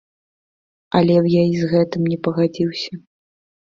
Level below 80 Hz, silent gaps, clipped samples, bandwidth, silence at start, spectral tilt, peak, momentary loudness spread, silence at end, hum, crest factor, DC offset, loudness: -56 dBFS; none; under 0.1%; 7.2 kHz; 0.95 s; -8 dB/octave; -2 dBFS; 11 LU; 0.65 s; none; 18 dB; under 0.1%; -18 LUFS